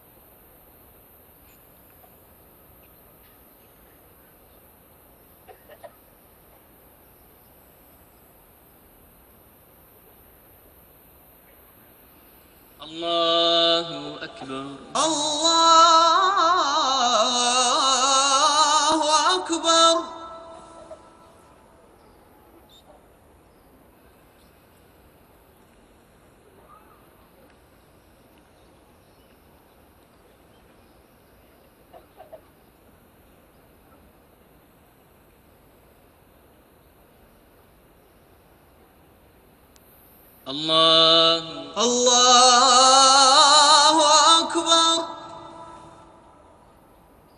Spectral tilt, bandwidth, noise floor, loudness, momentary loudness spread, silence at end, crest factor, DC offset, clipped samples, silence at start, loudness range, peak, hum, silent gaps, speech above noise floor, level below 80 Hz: -0.5 dB/octave; 14 kHz; -55 dBFS; -16 LUFS; 22 LU; 1.6 s; 22 dB; under 0.1%; under 0.1%; 12.8 s; 10 LU; -2 dBFS; none; none; 31 dB; -62 dBFS